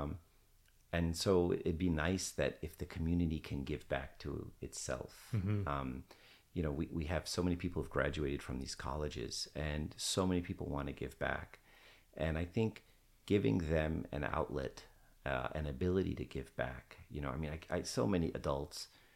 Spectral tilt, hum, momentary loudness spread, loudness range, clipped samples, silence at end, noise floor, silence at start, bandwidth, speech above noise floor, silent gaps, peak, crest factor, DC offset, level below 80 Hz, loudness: -5.5 dB/octave; none; 11 LU; 4 LU; under 0.1%; 0.3 s; -68 dBFS; 0 s; 16.5 kHz; 30 dB; none; -18 dBFS; 20 dB; under 0.1%; -50 dBFS; -39 LUFS